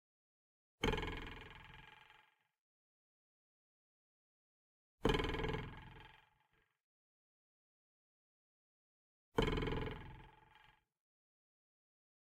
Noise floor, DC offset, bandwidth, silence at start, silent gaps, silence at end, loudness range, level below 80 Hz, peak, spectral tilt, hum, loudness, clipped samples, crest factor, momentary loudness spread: -80 dBFS; under 0.1%; 16 kHz; 0.8 s; 2.58-4.98 s, 6.83-9.32 s; 1.95 s; 12 LU; -54 dBFS; -20 dBFS; -5.5 dB/octave; none; -41 LUFS; under 0.1%; 26 dB; 22 LU